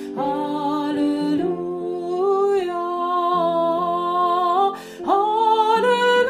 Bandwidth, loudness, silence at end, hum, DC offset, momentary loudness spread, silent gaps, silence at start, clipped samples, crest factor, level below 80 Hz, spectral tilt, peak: 15 kHz; -20 LUFS; 0 s; none; under 0.1%; 8 LU; none; 0 s; under 0.1%; 14 dB; -64 dBFS; -5.5 dB/octave; -6 dBFS